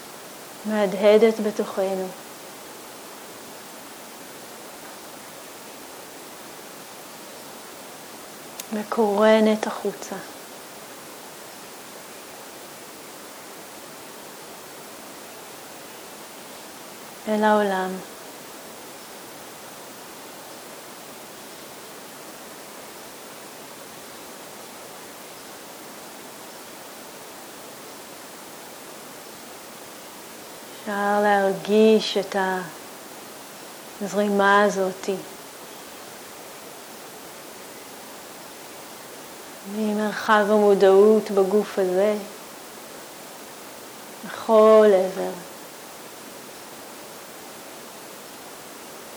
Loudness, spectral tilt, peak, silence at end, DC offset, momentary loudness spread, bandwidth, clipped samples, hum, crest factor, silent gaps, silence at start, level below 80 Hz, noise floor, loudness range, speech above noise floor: -21 LUFS; -4.5 dB/octave; -6 dBFS; 0 s; under 0.1%; 21 LU; over 20 kHz; under 0.1%; none; 20 dB; none; 0 s; -74 dBFS; -40 dBFS; 18 LU; 21 dB